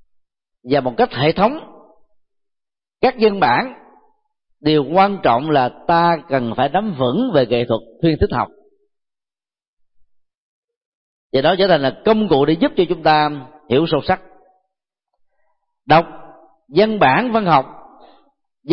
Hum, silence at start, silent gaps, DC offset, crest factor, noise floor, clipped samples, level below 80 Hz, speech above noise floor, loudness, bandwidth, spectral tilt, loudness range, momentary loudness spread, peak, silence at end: none; 0.65 s; 9.68-9.77 s, 10.37-10.68 s, 10.76-11.30 s; under 0.1%; 16 dB; under -90 dBFS; under 0.1%; -44 dBFS; over 74 dB; -16 LUFS; 5.8 kHz; -11 dB/octave; 5 LU; 7 LU; -2 dBFS; 0 s